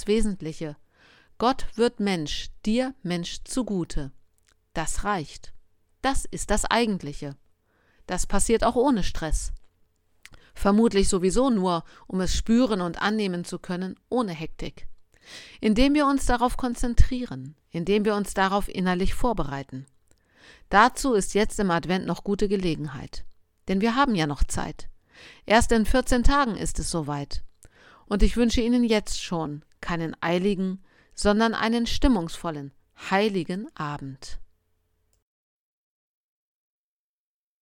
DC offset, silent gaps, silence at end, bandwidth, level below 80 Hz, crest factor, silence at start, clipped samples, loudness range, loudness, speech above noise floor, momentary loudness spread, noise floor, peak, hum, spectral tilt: under 0.1%; none; 3.2 s; 16 kHz; -34 dBFS; 22 dB; 0 s; under 0.1%; 5 LU; -25 LUFS; 46 dB; 16 LU; -70 dBFS; -4 dBFS; none; -5 dB/octave